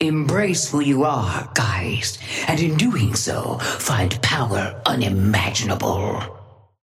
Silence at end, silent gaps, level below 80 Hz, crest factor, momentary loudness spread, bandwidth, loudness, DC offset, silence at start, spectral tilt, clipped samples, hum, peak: 0.4 s; none; -48 dBFS; 18 dB; 5 LU; 16 kHz; -20 LUFS; under 0.1%; 0 s; -4.5 dB/octave; under 0.1%; none; -4 dBFS